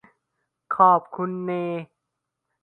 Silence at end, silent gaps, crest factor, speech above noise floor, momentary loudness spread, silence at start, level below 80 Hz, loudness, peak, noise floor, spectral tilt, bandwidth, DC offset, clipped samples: 0.75 s; none; 22 dB; 60 dB; 13 LU; 0.7 s; -76 dBFS; -22 LUFS; -4 dBFS; -82 dBFS; -9.5 dB/octave; 4.2 kHz; under 0.1%; under 0.1%